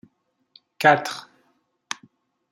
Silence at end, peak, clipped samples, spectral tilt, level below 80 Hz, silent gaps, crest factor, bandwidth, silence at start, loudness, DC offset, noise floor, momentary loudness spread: 1.3 s; -2 dBFS; under 0.1%; -4 dB/octave; -76 dBFS; none; 24 dB; 16 kHz; 0.8 s; -20 LUFS; under 0.1%; -67 dBFS; 17 LU